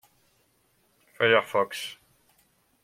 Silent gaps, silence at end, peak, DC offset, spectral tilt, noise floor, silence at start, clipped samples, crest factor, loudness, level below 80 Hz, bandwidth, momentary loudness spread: none; 0.9 s; -4 dBFS; under 0.1%; -3.5 dB/octave; -68 dBFS; 1.2 s; under 0.1%; 26 dB; -25 LUFS; -74 dBFS; 16 kHz; 14 LU